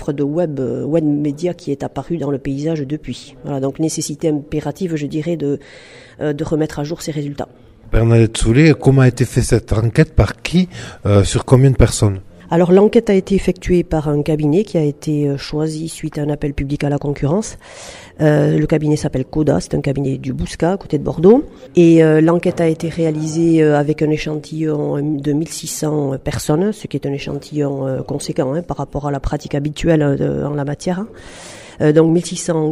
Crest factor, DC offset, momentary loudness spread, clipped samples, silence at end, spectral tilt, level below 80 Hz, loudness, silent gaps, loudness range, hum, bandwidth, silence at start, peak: 16 dB; under 0.1%; 12 LU; under 0.1%; 0 s; -6.5 dB/octave; -32 dBFS; -16 LUFS; none; 7 LU; none; 14 kHz; 0 s; 0 dBFS